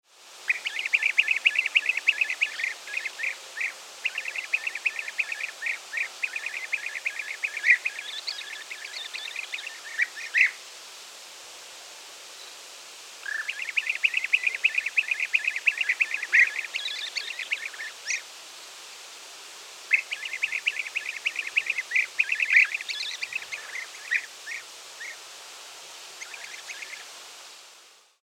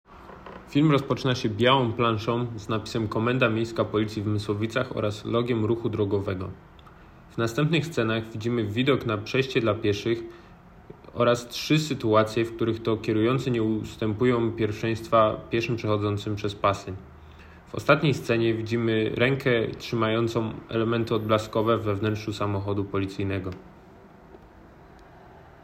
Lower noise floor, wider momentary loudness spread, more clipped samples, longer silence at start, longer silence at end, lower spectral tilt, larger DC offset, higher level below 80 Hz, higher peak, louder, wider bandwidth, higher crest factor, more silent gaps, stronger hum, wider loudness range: first, -54 dBFS vs -50 dBFS; first, 20 LU vs 8 LU; neither; about the same, 0.15 s vs 0.1 s; about the same, 0.3 s vs 0.2 s; second, 3.5 dB/octave vs -6.5 dB/octave; neither; second, under -90 dBFS vs -54 dBFS; about the same, -6 dBFS vs -4 dBFS; about the same, -26 LUFS vs -25 LUFS; about the same, 17 kHz vs 15.5 kHz; about the same, 24 dB vs 22 dB; neither; neither; first, 10 LU vs 3 LU